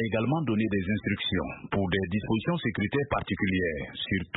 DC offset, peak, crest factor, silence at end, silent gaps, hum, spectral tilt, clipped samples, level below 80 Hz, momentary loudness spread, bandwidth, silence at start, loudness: under 0.1%; -12 dBFS; 16 dB; 0 s; none; none; -10.5 dB/octave; under 0.1%; -50 dBFS; 4 LU; 4.1 kHz; 0 s; -29 LUFS